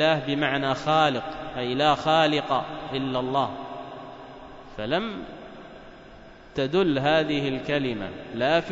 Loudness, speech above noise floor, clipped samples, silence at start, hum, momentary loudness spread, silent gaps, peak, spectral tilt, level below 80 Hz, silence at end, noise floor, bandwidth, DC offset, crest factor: -25 LUFS; 22 dB; under 0.1%; 0 s; none; 20 LU; none; -8 dBFS; -6 dB/octave; -52 dBFS; 0 s; -46 dBFS; 7.8 kHz; under 0.1%; 18 dB